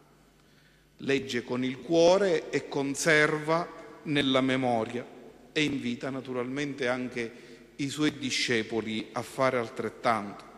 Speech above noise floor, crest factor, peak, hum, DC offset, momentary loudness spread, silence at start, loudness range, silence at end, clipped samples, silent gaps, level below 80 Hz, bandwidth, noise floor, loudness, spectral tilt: 32 dB; 18 dB; -10 dBFS; none; under 0.1%; 13 LU; 1 s; 6 LU; 0 s; under 0.1%; none; -66 dBFS; 13 kHz; -60 dBFS; -28 LUFS; -4.5 dB/octave